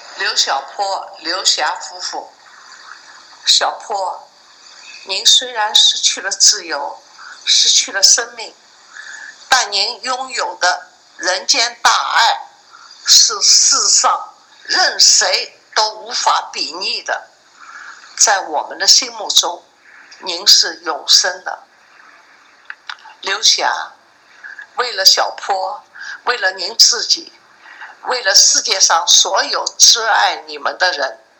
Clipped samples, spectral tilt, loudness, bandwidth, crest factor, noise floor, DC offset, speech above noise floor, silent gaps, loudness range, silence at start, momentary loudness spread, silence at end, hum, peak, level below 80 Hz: 0.2%; 4 dB/octave; -12 LUFS; over 20 kHz; 16 dB; -47 dBFS; under 0.1%; 32 dB; none; 7 LU; 0 s; 19 LU; 0.25 s; none; 0 dBFS; -68 dBFS